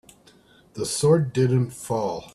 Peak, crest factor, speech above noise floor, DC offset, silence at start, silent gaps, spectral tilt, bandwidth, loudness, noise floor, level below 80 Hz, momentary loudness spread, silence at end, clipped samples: -6 dBFS; 18 dB; 32 dB; under 0.1%; 0.75 s; none; -6 dB/octave; 14 kHz; -23 LUFS; -55 dBFS; -58 dBFS; 10 LU; 0.05 s; under 0.1%